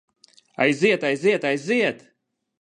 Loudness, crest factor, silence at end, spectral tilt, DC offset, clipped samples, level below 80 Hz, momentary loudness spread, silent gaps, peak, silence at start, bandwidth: -21 LUFS; 20 dB; 0.65 s; -5 dB/octave; under 0.1%; under 0.1%; -72 dBFS; 11 LU; none; -4 dBFS; 0.6 s; 10.5 kHz